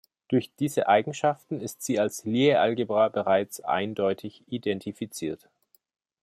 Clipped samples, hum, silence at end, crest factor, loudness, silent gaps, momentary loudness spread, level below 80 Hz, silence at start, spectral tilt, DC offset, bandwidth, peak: under 0.1%; none; 0.85 s; 18 dB; -26 LUFS; none; 12 LU; -72 dBFS; 0.3 s; -5 dB/octave; under 0.1%; 15.5 kHz; -8 dBFS